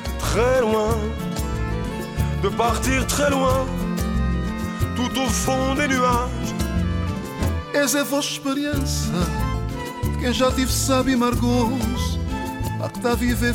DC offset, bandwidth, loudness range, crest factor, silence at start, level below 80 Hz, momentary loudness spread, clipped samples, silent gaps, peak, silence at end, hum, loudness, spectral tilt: under 0.1%; 17 kHz; 2 LU; 14 dB; 0 s; -30 dBFS; 7 LU; under 0.1%; none; -8 dBFS; 0 s; none; -22 LUFS; -5 dB/octave